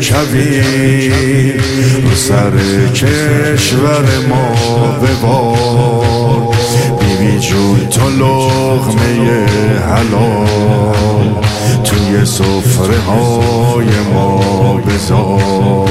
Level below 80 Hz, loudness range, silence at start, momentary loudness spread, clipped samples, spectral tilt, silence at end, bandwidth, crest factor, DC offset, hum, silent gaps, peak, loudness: -30 dBFS; 1 LU; 0 s; 2 LU; under 0.1%; -5.5 dB/octave; 0 s; 15.5 kHz; 10 dB; 0.3%; none; none; 0 dBFS; -10 LUFS